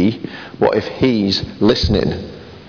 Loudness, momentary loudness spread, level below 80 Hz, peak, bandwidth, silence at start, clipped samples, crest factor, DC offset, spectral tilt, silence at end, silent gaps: -16 LUFS; 13 LU; -32 dBFS; -4 dBFS; 5.4 kHz; 0 s; under 0.1%; 14 dB; 0.1%; -6.5 dB/octave; 0 s; none